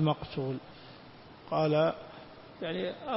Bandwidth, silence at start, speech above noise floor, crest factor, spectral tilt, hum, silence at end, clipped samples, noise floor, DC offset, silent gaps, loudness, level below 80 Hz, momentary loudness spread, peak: 5.8 kHz; 0 s; 20 dB; 18 dB; -10.5 dB/octave; none; 0 s; under 0.1%; -52 dBFS; under 0.1%; none; -32 LUFS; -62 dBFS; 23 LU; -14 dBFS